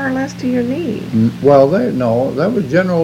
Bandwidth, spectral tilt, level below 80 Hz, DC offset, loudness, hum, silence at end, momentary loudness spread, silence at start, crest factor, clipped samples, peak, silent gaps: 15.5 kHz; -8 dB/octave; -46 dBFS; under 0.1%; -14 LUFS; none; 0 s; 9 LU; 0 s; 14 dB; 0.2%; 0 dBFS; none